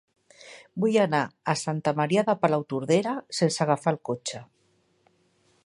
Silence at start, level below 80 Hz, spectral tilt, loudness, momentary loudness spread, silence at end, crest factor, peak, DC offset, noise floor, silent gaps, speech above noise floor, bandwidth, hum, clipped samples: 0.4 s; -72 dBFS; -5.5 dB/octave; -26 LUFS; 12 LU; 1.2 s; 20 dB; -6 dBFS; under 0.1%; -67 dBFS; none; 42 dB; 11.5 kHz; none; under 0.1%